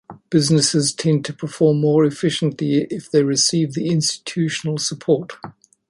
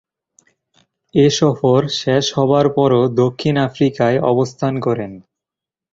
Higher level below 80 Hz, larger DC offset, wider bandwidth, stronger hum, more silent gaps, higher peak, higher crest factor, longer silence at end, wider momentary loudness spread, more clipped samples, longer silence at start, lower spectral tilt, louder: second, -60 dBFS vs -52 dBFS; neither; first, 11.5 kHz vs 7.8 kHz; neither; neither; about the same, -4 dBFS vs -2 dBFS; about the same, 16 dB vs 16 dB; second, 0.4 s vs 0.75 s; about the same, 7 LU vs 6 LU; neither; second, 0.1 s vs 1.15 s; second, -4.5 dB/octave vs -6 dB/octave; second, -19 LUFS vs -16 LUFS